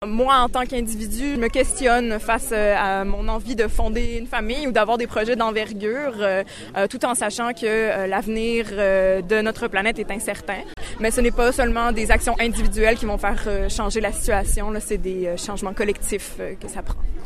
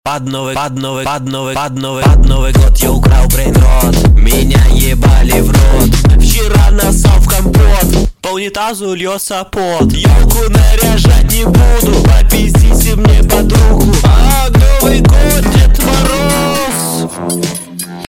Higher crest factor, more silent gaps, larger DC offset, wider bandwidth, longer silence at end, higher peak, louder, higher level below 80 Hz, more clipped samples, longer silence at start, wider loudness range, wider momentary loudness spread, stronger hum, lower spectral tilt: first, 20 dB vs 8 dB; neither; neither; second, 14 kHz vs 16.5 kHz; about the same, 0 s vs 0.1 s; about the same, 0 dBFS vs 0 dBFS; second, -22 LUFS vs -10 LUFS; second, -28 dBFS vs -10 dBFS; neither; about the same, 0 s vs 0.05 s; about the same, 2 LU vs 3 LU; about the same, 8 LU vs 8 LU; neither; about the same, -4 dB/octave vs -5 dB/octave